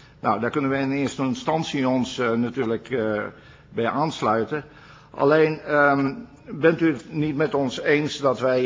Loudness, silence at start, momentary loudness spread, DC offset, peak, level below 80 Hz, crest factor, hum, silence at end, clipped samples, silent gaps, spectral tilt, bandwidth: -23 LUFS; 0.25 s; 9 LU; under 0.1%; -4 dBFS; -58 dBFS; 18 dB; none; 0 s; under 0.1%; none; -6 dB/octave; 7.6 kHz